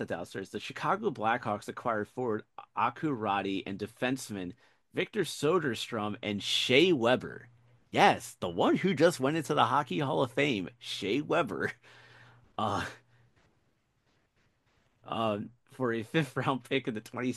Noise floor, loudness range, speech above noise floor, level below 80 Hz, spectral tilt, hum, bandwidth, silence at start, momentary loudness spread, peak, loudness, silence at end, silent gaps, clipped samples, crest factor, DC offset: -73 dBFS; 11 LU; 43 dB; -72 dBFS; -5 dB/octave; none; 12.5 kHz; 0 s; 14 LU; -6 dBFS; -31 LUFS; 0 s; none; under 0.1%; 26 dB; under 0.1%